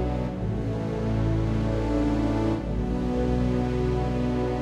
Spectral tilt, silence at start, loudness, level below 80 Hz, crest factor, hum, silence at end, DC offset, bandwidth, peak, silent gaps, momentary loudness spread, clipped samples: -8.5 dB/octave; 0 s; -26 LUFS; -32 dBFS; 12 dB; none; 0 s; under 0.1%; 9.4 kHz; -14 dBFS; none; 4 LU; under 0.1%